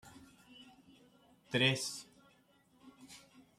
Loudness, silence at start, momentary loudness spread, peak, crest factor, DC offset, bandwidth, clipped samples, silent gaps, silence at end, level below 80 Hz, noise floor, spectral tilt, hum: -34 LUFS; 0.05 s; 28 LU; -16 dBFS; 26 dB; under 0.1%; 14 kHz; under 0.1%; none; 0.4 s; -76 dBFS; -69 dBFS; -3.5 dB/octave; none